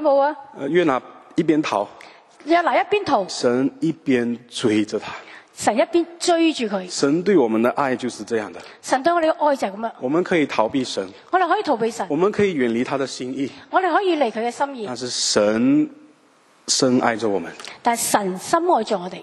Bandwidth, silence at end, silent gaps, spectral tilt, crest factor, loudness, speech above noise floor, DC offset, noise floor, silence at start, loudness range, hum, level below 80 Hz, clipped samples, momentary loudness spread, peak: 12.5 kHz; 0 s; none; -4 dB/octave; 20 dB; -20 LUFS; 35 dB; under 0.1%; -55 dBFS; 0 s; 1 LU; none; -64 dBFS; under 0.1%; 9 LU; -2 dBFS